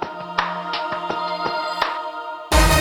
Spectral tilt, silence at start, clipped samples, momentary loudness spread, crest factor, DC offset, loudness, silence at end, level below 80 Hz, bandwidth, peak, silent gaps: -3.5 dB/octave; 0 s; under 0.1%; 9 LU; 20 dB; under 0.1%; -23 LUFS; 0 s; -28 dBFS; 19 kHz; -2 dBFS; none